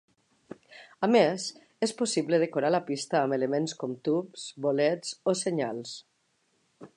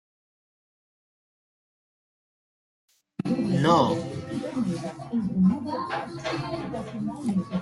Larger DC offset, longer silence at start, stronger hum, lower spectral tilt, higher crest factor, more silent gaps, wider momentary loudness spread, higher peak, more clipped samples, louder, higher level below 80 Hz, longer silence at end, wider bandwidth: neither; second, 0.7 s vs 3.2 s; neither; second, -4.5 dB/octave vs -7 dB/octave; about the same, 20 dB vs 20 dB; neither; about the same, 14 LU vs 12 LU; about the same, -10 dBFS vs -8 dBFS; neither; about the same, -28 LUFS vs -27 LUFS; second, -80 dBFS vs -60 dBFS; about the same, 0.1 s vs 0 s; about the same, 11 kHz vs 11.5 kHz